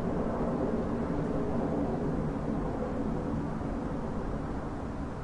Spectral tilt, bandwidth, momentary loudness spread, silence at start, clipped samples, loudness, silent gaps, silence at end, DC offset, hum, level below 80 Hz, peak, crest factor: -9 dB/octave; 11 kHz; 5 LU; 0 s; under 0.1%; -33 LUFS; none; 0 s; under 0.1%; none; -42 dBFS; -18 dBFS; 14 dB